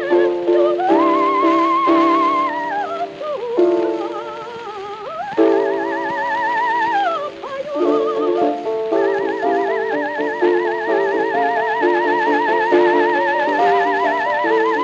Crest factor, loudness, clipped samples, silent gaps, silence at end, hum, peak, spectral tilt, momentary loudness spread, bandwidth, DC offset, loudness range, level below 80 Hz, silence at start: 14 dB; -17 LUFS; under 0.1%; none; 0 s; none; -4 dBFS; -5 dB/octave; 10 LU; 7.6 kHz; under 0.1%; 4 LU; -64 dBFS; 0 s